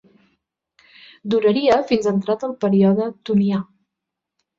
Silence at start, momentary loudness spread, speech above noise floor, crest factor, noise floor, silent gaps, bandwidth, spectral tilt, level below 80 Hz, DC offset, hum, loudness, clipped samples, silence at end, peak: 1.25 s; 9 LU; 65 dB; 16 dB; -83 dBFS; none; 7.6 kHz; -7.5 dB/octave; -60 dBFS; under 0.1%; none; -19 LUFS; under 0.1%; 0.95 s; -4 dBFS